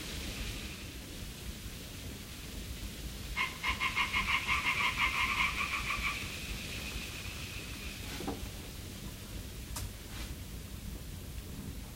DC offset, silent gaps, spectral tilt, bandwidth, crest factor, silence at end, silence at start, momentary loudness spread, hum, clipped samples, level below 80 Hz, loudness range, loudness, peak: under 0.1%; none; -2.5 dB/octave; 16 kHz; 20 dB; 0 s; 0 s; 15 LU; none; under 0.1%; -46 dBFS; 12 LU; -36 LUFS; -16 dBFS